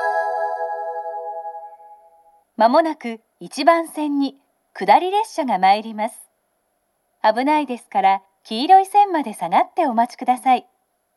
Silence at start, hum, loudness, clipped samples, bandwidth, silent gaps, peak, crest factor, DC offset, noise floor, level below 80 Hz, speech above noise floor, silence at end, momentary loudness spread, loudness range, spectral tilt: 0 s; none; -19 LUFS; under 0.1%; 12.5 kHz; none; 0 dBFS; 20 dB; under 0.1%; -69 dBFS; -80 dBFS; 51 dB; 0.55 s; 14 LU; 4 LU; -4 dB/octave